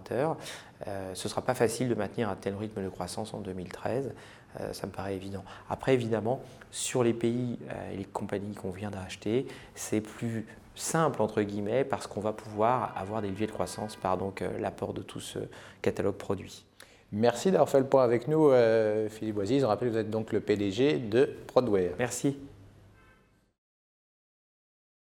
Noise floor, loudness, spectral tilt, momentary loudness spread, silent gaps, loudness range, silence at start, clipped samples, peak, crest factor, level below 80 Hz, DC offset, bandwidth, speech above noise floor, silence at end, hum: -63 dBFS; -30 LUFS; -5.5 dB/octave; 14 LU; none; 9 LU; 0 s; under 0.1%; -8 dBFS; 22 dB; -62 dBFS; under 0.1%; 19.5 kHz; 33 dB; 2.5 s; none